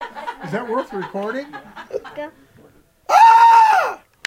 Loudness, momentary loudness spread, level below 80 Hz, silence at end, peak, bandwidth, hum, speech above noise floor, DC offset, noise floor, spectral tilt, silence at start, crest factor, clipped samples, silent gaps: -13 LUFS; 24 LU; -60 dBFS; 0.3 s; 0 dBFS; 15 kHz; none; 25 dB; under 0.1%; -51 dBFS; -3.5 dB/octave; 0 s; 16 dB; under 0.1%; none